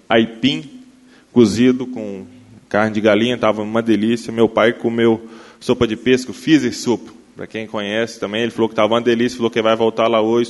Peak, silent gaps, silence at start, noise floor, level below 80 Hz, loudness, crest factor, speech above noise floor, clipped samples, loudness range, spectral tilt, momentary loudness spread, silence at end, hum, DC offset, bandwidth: 0 dBFS; none; 0.1 s; -47 dBFS; -52 dBFS; -17 LUFS; 18 dB; 31 dB; under 0.1%; 2 LU; -5.5 dB/octave; 11 LU; 0 s; none; under 0.1%; 11.5 kHz